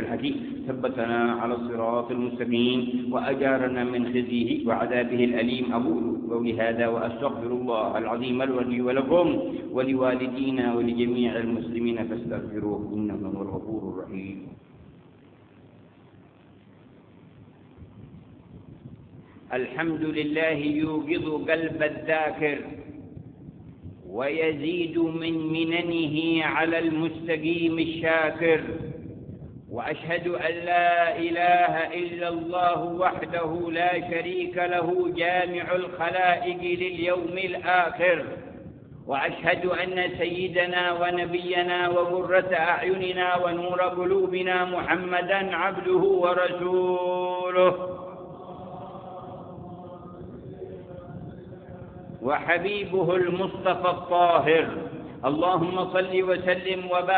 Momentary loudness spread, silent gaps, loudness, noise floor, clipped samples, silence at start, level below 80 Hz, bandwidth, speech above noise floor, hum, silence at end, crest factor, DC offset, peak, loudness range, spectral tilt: 18 LU; none; -25 LUFS; -53 dBFS; under 0.1%; 0 s; -58 dBFS; 4.6 kHz; 28 dB; none; 0 s; 22 dB; under 0.1%; -4 dBFS; 8 LU; -10 dB/octave